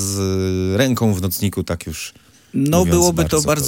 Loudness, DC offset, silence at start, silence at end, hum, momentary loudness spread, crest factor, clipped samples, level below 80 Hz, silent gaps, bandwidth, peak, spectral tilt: -18 LUFS; under 0.1%; 0 s; 0 s; none; 12 LU; 16 dB; under 0.1%; -40 dBFS; none; 17 kHz; -2 dBFS; -5 dB/octave